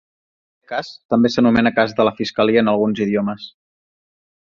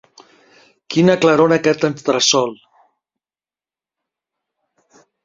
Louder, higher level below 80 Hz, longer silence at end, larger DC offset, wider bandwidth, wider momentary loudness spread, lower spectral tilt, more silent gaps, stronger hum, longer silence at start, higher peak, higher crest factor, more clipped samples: second, -18 LUFS vs -15 LUFS; first, -52 dBFS vs -60 dBFS; second, 0.95 s vs 2.7 s; neither; about the same, 7.2 kHz vs 7.6 kHz; first, 12 LU vs 7 LU; first, -6.5 dB/octave vs -4 dB/octave; first, 1.05-1.09 s vs none; neither; second, 0.7 s vs 0.9 s; about the same, -2 dBFS vs 0 dBFS; about the same, 16 dB vs 18 dB; neither